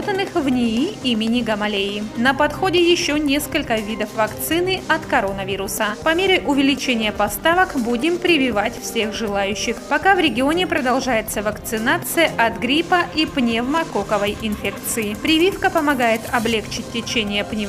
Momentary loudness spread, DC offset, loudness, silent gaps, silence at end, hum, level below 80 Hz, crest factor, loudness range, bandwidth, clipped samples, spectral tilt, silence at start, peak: 6 LU; under 0.1%; -19 LUFS; none; 0 s; none; -42 dBFS; 18 dB; 2 LU; 16 kHz; under 0.1%; -3.5 dB/octave; 0 s; -2 dBFS